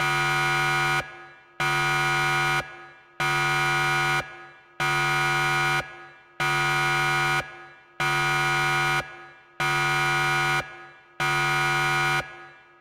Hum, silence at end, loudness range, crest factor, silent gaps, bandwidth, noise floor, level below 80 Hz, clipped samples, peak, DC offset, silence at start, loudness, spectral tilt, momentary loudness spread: none; 0.3 s; 0 LU; 12 dB; none; 16 kHz; -46 dBFS; -52 dBFS; under 0.1%; -14 dBFS; under 0.1%; 0 s; -23 LUFS; -3 dB/octave; 6 LU